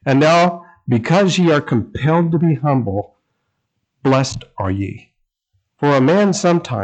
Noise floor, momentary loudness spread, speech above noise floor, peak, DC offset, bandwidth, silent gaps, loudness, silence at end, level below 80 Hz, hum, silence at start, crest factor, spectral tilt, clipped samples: -72 dBFS; 11 LU; 57 dB; -2 dBFS; under 0.1%; 8.8 kHz; none; -16 LUFS; 0 s; -52 dBFS; none; 0.05 s; 14 dB; -6 dB/octave; under 0.1%